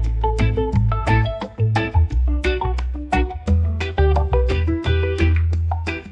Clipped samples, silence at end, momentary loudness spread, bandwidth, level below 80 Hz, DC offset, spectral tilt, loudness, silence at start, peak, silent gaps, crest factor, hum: under 0.1%; 0 s; 5 LU; 8.4 kHz; -22 dBFS; under 0.1%; -7.5 dB/octave; -20 LUFS; 0 s; -4 dBFS; none; 14 dB; none